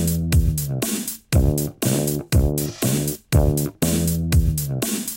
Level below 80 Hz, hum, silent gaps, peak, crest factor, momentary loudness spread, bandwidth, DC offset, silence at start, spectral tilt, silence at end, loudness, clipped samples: -26 dBFS; none; none; -4 dBFS; 16 dB; 4 LU; 17 kHz; under 0.1%; 0 s; -5.5 dB/octave; 0 s; -21 LUFS; under 0.1%